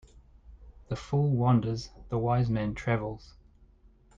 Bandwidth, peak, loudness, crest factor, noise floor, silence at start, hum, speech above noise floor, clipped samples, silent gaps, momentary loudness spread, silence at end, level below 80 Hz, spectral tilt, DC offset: 7.6 kHz; -12 dBFS; -29 LUFS; 18 dB; -59 dBFS; 0.5 s; none; 31 dB; under 0.1%; none; 14 LU; 0.9 s; -50 dBFS; -8 dB/octave; under 0.1%